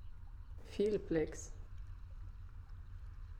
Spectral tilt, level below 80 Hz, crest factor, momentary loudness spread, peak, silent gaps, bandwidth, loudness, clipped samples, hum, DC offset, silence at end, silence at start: -6 dB/octave; -50 dBFS; 20 dB; 18 LU; -24 dBFS; none; 11 kHz; -39 LUFS; under 0.1%; none; under 0.1%; 0 s; 0 s